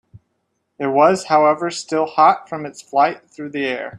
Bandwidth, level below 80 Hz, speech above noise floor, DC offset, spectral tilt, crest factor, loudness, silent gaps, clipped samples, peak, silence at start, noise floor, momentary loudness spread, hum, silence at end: 11 kHz; -66 dBFS; 54 dB; under 0.1%; -4.5 dB/octave; 18 dB; -17 LUFS; none; under 0.1%; -2 dBFS; 0.15 s; -71 dBFS; 15 LU; none; 0 s